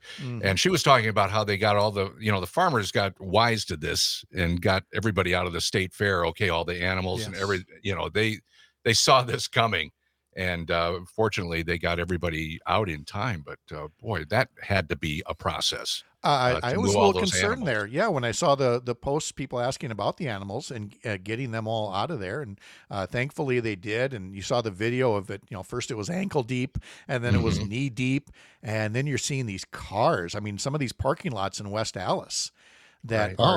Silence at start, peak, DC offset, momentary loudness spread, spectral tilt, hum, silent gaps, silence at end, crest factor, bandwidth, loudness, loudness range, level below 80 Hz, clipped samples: 0.05 s; -2 dBFS; under 0.1%; 11 LU; -4.5 dB/octave; none; none; 0 s; 24 dB; 16.5 kHz; -26 LUFS; 6 LU; -52 dBFS; under 0.1%